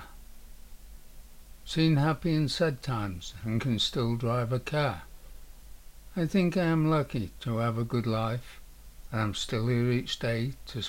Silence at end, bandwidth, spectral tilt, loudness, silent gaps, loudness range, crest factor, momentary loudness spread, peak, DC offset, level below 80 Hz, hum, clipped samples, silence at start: 0 s; 16 kHz; -6 dB/octave; -29 LUFS; none; 2 LU; 16 dB; 11 LU; -14 dBFS; under 0.1%; -48 dBFS; none; under 0.1%; 0 s